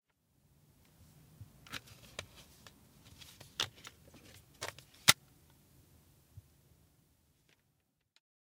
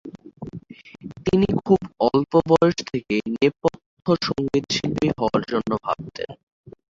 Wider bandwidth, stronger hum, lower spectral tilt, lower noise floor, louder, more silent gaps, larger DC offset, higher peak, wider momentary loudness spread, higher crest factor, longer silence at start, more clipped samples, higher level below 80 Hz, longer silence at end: first, 17 kHz vs 7.8 kHz; neither; second, -0.5 dB/octave vs -6 dB/octave; first, -79 dBFS vs -39 dBFS; second, -35 LUFS vs -22 LUFS; second, none vs 3.86-3.97 s, 6.43-6.64 s; neither; about the same, -4 dBFS vs -4 dBFS; first, 31 LU vs 19 LU; first, 40 dB vs 20 dB; first, 1.4 s vs 0.05 s; neither; second, -72 dBFS vs -50 dBFS; first, 3.35 s vs 0.25 s